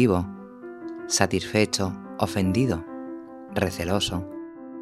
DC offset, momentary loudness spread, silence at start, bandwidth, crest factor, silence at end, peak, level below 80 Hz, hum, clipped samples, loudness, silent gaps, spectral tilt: under 0.1%; 16 LU; 0 s; 15 kHz; 24 dB; 0 s; -2 dBFS; -50 dBFS; none; under 0.1%; -25 LUFS; none; -4.5 dB/octave